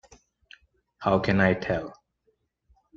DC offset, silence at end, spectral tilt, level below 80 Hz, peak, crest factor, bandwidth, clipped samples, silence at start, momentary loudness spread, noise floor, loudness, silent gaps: under 0.1%; 1.05 s; -7.5 dB/octave; -52 dBFS; -8 dBFS; 22 dB; 7.2 kHz; under 0.1%; 1 s; 9 LU; -72 dBFS; -25 LUFS; none